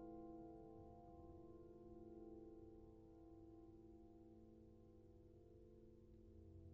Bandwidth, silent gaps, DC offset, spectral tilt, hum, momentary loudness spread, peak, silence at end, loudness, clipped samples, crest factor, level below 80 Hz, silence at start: 3.3 kHz; none; under 0.1%; -9.5 dB/octave; none; 8 LU; -46 dBFS; 0 s; -63 LUFS; under 0.1%; 14 dB; -72 dBFS; 0 s